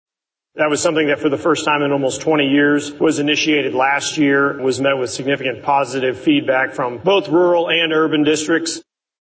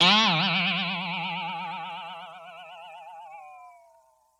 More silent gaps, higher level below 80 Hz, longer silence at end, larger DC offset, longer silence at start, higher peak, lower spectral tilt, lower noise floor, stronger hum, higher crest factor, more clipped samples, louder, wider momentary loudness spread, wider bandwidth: neither; first, -58 dBFS vs -86 dBFS; second, 0.4 s vs 0.7 s; neither; first, 0.55 s vs 0 s; first, -4 dBFS vs -8 dBFS; about the same, -4 dB/octave vs -3.5 dB/octave; first, -66 dBFS vs -62 dBFS; neither; second, 12 dB vs 22 dB; neither; first, -16 LUFS vs -25 LUFS; second, 5 LU vs 23 LU; second, 8 kHz vs 11 kHz